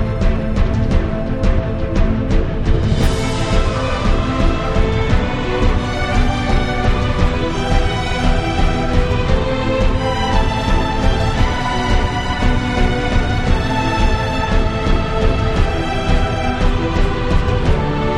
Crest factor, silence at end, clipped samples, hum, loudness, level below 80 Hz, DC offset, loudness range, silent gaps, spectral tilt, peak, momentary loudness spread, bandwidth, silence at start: 14 dB; 0 s; under 0.1%; none; -18 LUFS; -18 dBFS; under 0.1%; 1 LU; none; -6.5 dB/octave; -2 dBFS; 2 LU; 10 kHz; 0 s